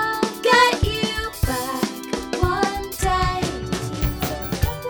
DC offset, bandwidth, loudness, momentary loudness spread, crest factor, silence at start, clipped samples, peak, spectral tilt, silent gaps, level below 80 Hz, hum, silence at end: under 0.1%; over 20 kHz; -22 LUFS; 11 LU; 20 dB; 0 s; under 0.1%; -2 dBFS; -4.5 dB/octave; none; -30 dBFS; none; 0 s